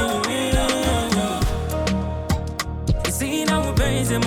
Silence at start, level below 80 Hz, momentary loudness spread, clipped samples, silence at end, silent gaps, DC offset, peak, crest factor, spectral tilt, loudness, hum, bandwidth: 0 s; -30 dBFS; 5 LU; under 0.1%; 0 s; none; under 0.1%; -6 dBFS; 14 dB; -4.5 dB/octave; -22 LUFS; none; 18 kHz